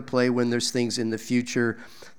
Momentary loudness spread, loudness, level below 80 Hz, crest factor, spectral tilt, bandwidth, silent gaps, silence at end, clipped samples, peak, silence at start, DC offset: 5 LU; -25 LUFS; -68 dBFS; 18 dB; -4.5 dB/octave; 16.5 kHz; none; 0.1 s; under 0.1%; -8 dBFS; 0 s; 0.5%